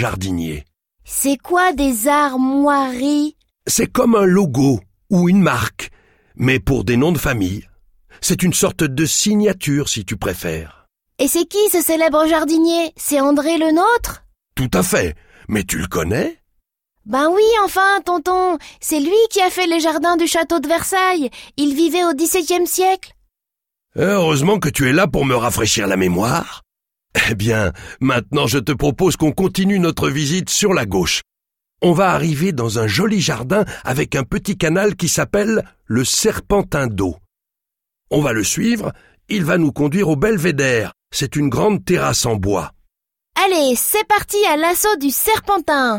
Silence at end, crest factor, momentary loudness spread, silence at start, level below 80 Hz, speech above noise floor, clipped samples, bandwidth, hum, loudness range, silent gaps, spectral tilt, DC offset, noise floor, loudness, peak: 0 s; 14 dB; 8 LU; 0 s; -40 dBFS; 67 dB; under 0.1%; 17 kHz; none; 3 LU; none; -4.5 dB/octave; under 0.1%; -83 dBFS; -16 LUFS; -2 dBFS